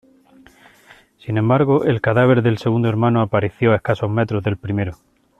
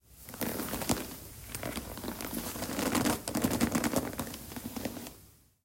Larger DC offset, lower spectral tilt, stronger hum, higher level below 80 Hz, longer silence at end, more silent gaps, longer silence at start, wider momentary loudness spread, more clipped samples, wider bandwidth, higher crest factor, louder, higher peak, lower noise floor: neither; first, -9 dB/octave vs -4 dB/octave; neither; about the same, -50 dBFS vs -52 dBFS; about the same, 0.45 s vs 0.35 s; neither; first, 1.25 s vs 0.1 s; second, 9 LU vs 12 LU; neither; second, 6.6 kHz vs 16.5 kHz; second, 16 dB vs 28 dB; first, -18 LUFS vs -34 LUFS; first, -2 dBFS vs -8 dBFS; second, -49 dBFS vs -58 dBFS